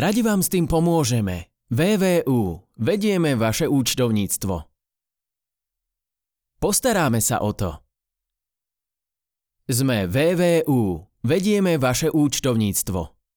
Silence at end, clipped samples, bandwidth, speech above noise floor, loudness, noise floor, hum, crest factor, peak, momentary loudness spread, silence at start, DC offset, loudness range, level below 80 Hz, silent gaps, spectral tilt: 0.3 s; under 0.1%; over 20 kHz; 67 dB; -21 LUFS; -87 dBFS; none; 14 dB; -8 dBFS; 9 LU; 0 s; under 0.1%; 5 LU; -46 dBFS; none; -5 dB/octave